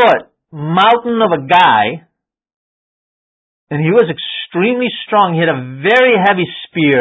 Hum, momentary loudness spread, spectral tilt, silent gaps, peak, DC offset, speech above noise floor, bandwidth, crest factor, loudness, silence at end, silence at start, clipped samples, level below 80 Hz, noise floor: none; 10 LU; -7 dB/octave; 2.54-3.67 s; 0 dBFS; under 0.1%; over 78 dB; 8 kHz; 14 dB; -12 LUFS; 0 s; 0 s; under 0.1%; -60 dBFS; under -90 dBFS